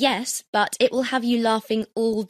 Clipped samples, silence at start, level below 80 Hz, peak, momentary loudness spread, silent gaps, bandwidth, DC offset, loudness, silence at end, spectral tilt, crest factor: under 0.1%; 0 s; -64 dBFS; -6 dBFS; 4 LU; 0.48-0.53 s; 14 kHz; under 0.1%; -22 LUFS; 0.05 s; -3 dB/octave; 16 dB